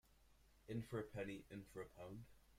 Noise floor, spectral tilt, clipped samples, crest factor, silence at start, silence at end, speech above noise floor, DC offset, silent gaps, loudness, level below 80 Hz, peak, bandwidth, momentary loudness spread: -72 dBFS; -7 dB/octave; under 0.1%; 20 dB; 0.05 s; 0 s; 21 dB; under 0.1%; none; -52 LUFS; -72 dBFS; -34 dBFS; 16 kHz; 10 LU